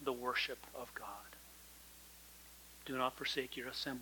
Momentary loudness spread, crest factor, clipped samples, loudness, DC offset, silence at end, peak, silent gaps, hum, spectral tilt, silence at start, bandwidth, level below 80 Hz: 18 LU; 24 dB; under 0.1%; -41 LUFS; under 0.1%; 0 s; -20 dBFS; none; none; -2.5 dB/octave; 0 s; 19 kHz; -68 dBFS